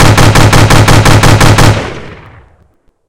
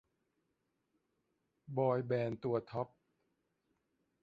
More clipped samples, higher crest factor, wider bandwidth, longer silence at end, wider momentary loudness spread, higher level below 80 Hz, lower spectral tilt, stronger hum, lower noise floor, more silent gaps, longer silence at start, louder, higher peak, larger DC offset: first, 10% vs under 0.1%; second, 6 dB vs 20 dB; first, 17 kHz vs 5.2 kHz; second, 0.8 s vs 1.35 s; about the same, 11 LU vs 9 LU; first, -14 dBFS vs -76 dBFS; second, -5 dB/octave vs -7.5 dB/octave; neither; second, -49 dBFS vs -84 dBFS; neither; second, 0 s vs 1.7 s; first, -5 LUFS vs -38 LUFS; first, 0 dBFS vs -20 dBFS; neither